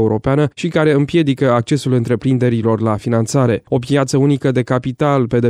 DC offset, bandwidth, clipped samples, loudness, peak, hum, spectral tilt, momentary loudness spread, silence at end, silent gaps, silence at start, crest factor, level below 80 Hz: under 0.1%; 13 kHz; under 0.1%; -15 LUFS; -2 dBFS; none; -7 dB/octave; 3 LU; 0 s; none; 0 s; 12 dB; -46 dBFS